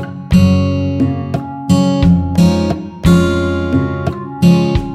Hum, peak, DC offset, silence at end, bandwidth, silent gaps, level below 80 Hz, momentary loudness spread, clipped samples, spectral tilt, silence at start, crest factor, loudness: none; 0 dBFS; under 0.1%; 0 s; 13 kHz; none; -28 dBFS; 9 LU; under 0.1%; -7.5 dB/octave; 0 s; 12 dB; -13 LUFS